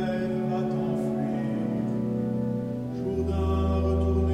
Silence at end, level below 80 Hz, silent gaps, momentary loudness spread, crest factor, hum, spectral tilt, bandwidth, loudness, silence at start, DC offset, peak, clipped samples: 0 s; -36 dBFS; none; 5 LU; 12 dB; none; -9 dB/octave; 9.4 kHz; -28 LUFS; 0 s; under 0.1%; -14 dBFS; under 0.1%